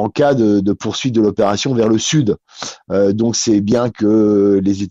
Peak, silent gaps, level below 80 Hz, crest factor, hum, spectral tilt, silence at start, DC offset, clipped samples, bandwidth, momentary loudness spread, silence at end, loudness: -4 dBFS; none; -50 dBFS; 12 dB; none; -5.5 dB/octave; 0 s; under 0.1%; under 0.1%; 8 kHz; 7 LU; 0 s; -15 LUFS